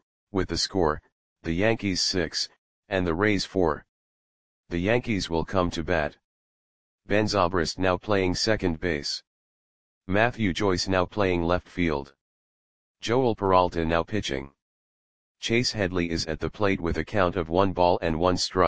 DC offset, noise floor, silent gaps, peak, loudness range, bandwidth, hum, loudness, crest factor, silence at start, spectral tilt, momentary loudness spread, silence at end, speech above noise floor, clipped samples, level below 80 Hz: 0.9%; under -90 dBFS; 0.02-0.27 s, 1.12-1.36 s, 2.58-2.83 s, 3.89-4.64 s, 6.24-6.99 s, 9.27-10.01 s, 12.21-12.95 s, 14.62-15.35 s; -4 dBFS; 2 LU; 10 kHz; none; -26 LUFS; 22 dB; 0 s; -5 dB/octave; 8 LU; 0 s; over 65 dB; under 0.1%; -46 dBFS